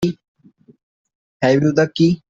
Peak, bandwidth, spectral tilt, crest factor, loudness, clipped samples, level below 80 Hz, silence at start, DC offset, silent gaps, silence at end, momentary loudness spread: 0 dBFS; 7.6 kHz; -7 dB/octave; 18 dB; -17 LUFS; under 0.1%; -54 dBFS; 0 s; under 0.1%; 0.28-0.35 s, 0.83-1.05 s, 1.15-1.40 s; 0.15 s; 10 LU